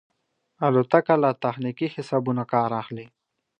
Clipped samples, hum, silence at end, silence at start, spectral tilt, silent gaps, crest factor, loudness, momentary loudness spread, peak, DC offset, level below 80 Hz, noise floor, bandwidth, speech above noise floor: under 0.1%; none; 0.55 s; 0.6 s; -8.5 dB/octave; none; 22 dB; -23 LUFS; 11 LU; -2 dBFS; under 0.1%; -72 dBFS; -72 dBFS; 9.4 kHz; 49 dB